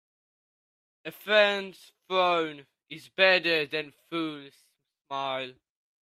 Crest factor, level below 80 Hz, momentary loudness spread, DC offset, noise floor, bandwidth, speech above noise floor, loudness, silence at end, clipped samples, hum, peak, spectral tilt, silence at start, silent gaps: 22 dB; -80 dBFS; 21 LU; under 0.1%; under -90 dBFS; 15 kHz; over 62 dB; -26 LUFS; 0.5 s; under 0.1%; none; -6 dBFS; -4 dB/octave; 1.05 s; 5.01-5.05 s